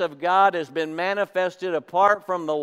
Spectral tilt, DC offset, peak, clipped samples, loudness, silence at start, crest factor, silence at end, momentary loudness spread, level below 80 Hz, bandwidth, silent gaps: -5 dB/octave; under 0.1%; -6 dBFS; under 0.1%; -22 LUFS; 0 s; 18 dB; 0 s; 8 LU; -82 dBFS; 14 kHz; none